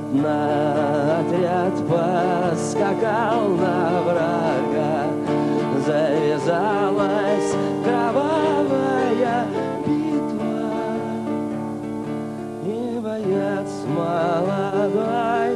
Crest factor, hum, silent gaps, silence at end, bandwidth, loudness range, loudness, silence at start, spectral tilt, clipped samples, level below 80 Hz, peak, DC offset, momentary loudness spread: 14 dB; none; none; 0 s; 12 kHz; 5 LU; -21 LUFS; 0 s; -6.5 dB/octave; under 0.1%; -60 dBFS; -6 dBFS; under 0.1%; 6 LU